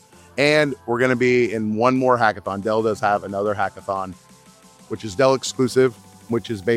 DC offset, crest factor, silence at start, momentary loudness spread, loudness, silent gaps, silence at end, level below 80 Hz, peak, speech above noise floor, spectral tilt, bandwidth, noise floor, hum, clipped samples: under 0.1%; 18 dB; 0.35 s; 10 LU; -20 LUFS; none; 0 s; -60 dBFS; -2 dBFS; 29 dB; -5 dB/octave; 14.5 kHz; -49 dBFS; none; under 0.1%